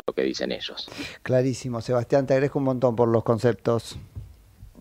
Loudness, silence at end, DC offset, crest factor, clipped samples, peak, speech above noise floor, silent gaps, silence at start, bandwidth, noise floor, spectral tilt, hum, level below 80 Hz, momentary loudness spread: -24 LUFS; 0 s; under 0.1%; 18 dB; under 0.1%; -6 dBFS; 24 dB; none; 0.05 s; 15.5 kHz; -48 dBFS; -6.5 dB/octave; none; -52 dBFS; 13 LU